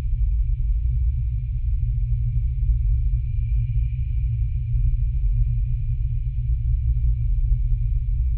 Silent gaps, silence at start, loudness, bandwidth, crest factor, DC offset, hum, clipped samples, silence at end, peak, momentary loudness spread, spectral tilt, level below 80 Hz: none; 0 s; -25 LUFS; 2.6 kHz; 10 dB; under 0.1%; none; under 0.1%; 0 s; -10 dBFS; 3 LU; -12 dB/octave; -22 dBFS